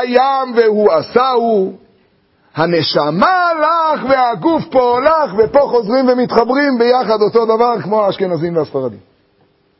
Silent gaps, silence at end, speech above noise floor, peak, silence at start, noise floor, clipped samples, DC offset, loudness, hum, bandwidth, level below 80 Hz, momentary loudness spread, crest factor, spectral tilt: none; 0.8 s; 43 dB; 0 dBFS; 0 s; -55 dBFS; under 0.1%; under 0.1%; -13 LUFS; none; 5.8 kHz; -50 dBFS; 6 LU; 14 dB; -8.5 dB/octave